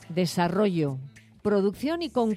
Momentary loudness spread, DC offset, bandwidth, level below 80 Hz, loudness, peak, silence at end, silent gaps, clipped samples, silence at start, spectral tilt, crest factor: 9 LU; under 0.1%; 15 kHz; -60 dBFS; -26 LUFS; -12 dBFS; 0 s; none; under 0.1%; 0 s; -6.5 dB/octave; 14 dB